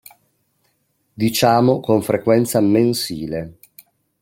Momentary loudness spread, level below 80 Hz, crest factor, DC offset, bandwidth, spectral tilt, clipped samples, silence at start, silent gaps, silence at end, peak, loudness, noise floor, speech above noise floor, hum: 12 LU; -54 dBFS; 18 dB; under 0.1%; 16.5 kHz; -5.5 dB/octave; under 0.1%; 1.2 s; none; 0.7 s; -2 dBFS; -17 LUFS; -66 dBFS; 50 dB; none